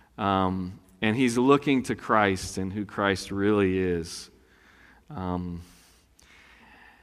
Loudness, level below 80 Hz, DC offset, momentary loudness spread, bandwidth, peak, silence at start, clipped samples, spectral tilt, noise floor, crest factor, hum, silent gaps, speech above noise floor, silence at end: -26 LUFS; -56 dBFS; under 0.1%; 16 LU; 14.5 kHz; -4 dBFS; 0.2 s; under 0.1%; -5.5 dB/octave; -58 dBFS; 22 dB; none; none; 32 dB; 1.4 s